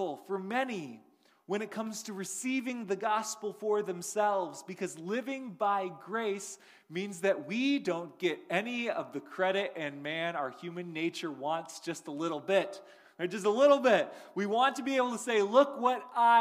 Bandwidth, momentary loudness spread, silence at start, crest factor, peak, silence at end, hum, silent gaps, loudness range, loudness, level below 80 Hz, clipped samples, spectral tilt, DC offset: 15.5 kHz; 13 LU; 0 s; 20 dB; -12 dBFS; 0 s; none; none; 7 LU; -32 LUFS; -86 dBFS; under 0.1%; -4 dB/octave; under 0.1%